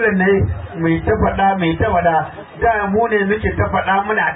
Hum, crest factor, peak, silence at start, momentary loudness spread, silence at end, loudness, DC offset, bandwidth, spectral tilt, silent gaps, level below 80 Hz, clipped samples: none; 12 dB; -4 dBFS; 0 s; 5 LU; 0 s; -16 LUFS; under 0.1%; 4 kHz; -12 dB/octave; none; -30 dBFS; under 0.1%